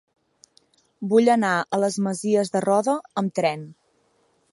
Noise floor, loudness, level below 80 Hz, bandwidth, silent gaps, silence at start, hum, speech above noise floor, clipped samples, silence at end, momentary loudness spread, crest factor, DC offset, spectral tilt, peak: -65 dBFS; -22 LUFS; -74 dBFS; 11.5 kHz; none; 1 s; none; 44 dB; under 0.1%; 0.8 s; 9 LU; 18 dB; under 0.1%; -5.5 dB/octave; -6 dBFS